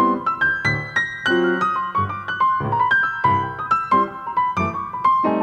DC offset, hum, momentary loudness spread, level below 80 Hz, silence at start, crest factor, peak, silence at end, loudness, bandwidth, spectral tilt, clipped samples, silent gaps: under 0.1%; none; 5 LU; -52 dBFS; 0 s; 14 dB; -4 dBFS; 0 s; -20 LUFS; 8.8 kHz; -6 dB/octave; under 0.1%; none